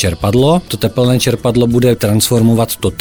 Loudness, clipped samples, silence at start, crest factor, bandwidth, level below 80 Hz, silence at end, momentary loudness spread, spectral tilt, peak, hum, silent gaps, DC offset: -12 LUFS; under 0.1%; 0 s; 12 dB; over 20 kHz; -34 dBFS; 0 s; 3 LU; -5.5 dB/octave; 0 dBFS; none; none; 1%